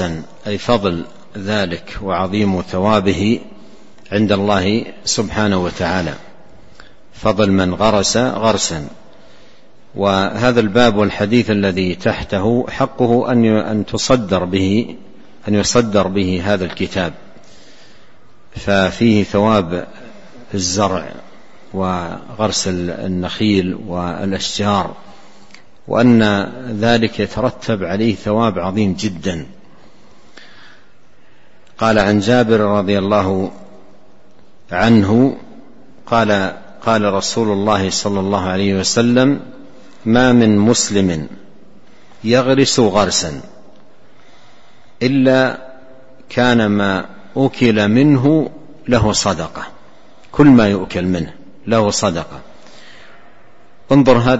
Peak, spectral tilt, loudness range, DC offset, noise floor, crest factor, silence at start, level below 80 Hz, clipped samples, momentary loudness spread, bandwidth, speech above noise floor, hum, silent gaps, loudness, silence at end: 0 dBFS; -5 dB/octave; 5 LU; 2%; -51 dBFS; 16 dB; 0 s; -42 dBFS; under 0.1%; 13 LU; 8.2 kHz; 37 dB; none; none; -15 LUFS; 0 s